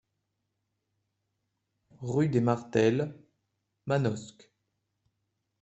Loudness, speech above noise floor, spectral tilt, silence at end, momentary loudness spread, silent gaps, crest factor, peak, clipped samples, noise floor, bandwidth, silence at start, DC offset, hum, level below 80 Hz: -29 LUFS; 54 dB; -7.5 dB/octave; 1.3 s; 16 LU; none; 22 dB; -10 dBFS; under 0.1%; -82 dBFS; 8.2 kHz; 2 s; under 0.1%; none; -68 dBFS